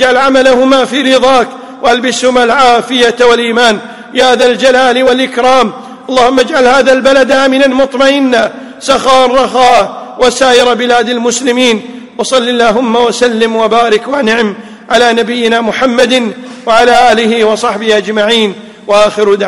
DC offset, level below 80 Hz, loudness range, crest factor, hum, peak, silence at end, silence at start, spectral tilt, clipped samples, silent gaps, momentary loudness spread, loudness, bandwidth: 1%; -42 dBFS; 2 LU; 8 dB; none; 0 dBFS; 0 s; 0 s; -3 dB/octave; 0.5%; none; 6 LU; -8 LUFS; 12 kHz